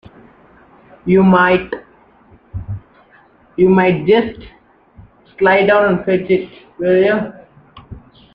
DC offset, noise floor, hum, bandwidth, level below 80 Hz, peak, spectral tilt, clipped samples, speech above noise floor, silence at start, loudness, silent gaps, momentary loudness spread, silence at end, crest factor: under 0.1%; -49 dBFS; none; 5.2 kHz; -46 dBFS; 0 dBFS; -9.5 dB/octave; under 0.1%; 36 dB; 1.05 s; -13 LUFS; none; 19 LU; 0.35 s; 16 dB